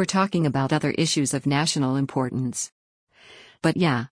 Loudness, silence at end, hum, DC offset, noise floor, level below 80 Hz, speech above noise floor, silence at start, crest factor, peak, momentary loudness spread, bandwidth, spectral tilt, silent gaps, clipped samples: -24 LUFS; 0.05 s; none; under 0.1%; -50 dBFS; -60 dBFS; 27 dB; 0 s; 16 dB; -8 dBFS; 5 LU; 10.5 kHz; -4.5 dB/octave; 2.72-3.07 s; under 0.1%